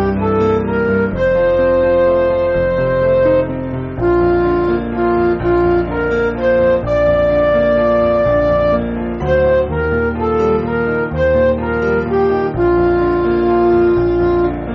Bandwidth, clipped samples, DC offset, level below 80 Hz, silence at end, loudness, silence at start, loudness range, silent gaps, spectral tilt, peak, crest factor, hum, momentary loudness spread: 6 kHz; under 0.1%; under 0.1%; -30 dBFS; 0 s; -14 LUFS; 0 s; 2 LU; none; -7 dB/octave; -2 dBFS; 10 dB; none; 4 LU